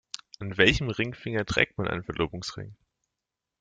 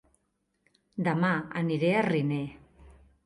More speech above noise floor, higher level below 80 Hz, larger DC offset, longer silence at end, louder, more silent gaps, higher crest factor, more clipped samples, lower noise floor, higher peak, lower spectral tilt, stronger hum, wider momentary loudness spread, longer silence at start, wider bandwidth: first, 59 dB vs 49 dB; first, -46 dBFS vs -62 dBFS; neither; first, 0.85 s vs 0.35 s; about the same, -27 LUFS vs -28 LUFS; neither; first, 26 dB vs 16 dB; neither; first, -87 dBFS vs -77 dBFS; first, -2 dBFS vs -14 dBFS; second, -4.5 dB/octave vs -8 dB/octave; neither; first, 17 LU vs 10 LU; second, 0.4 s vs 0.95 s; second, 9.4 kHz vs 11 kHz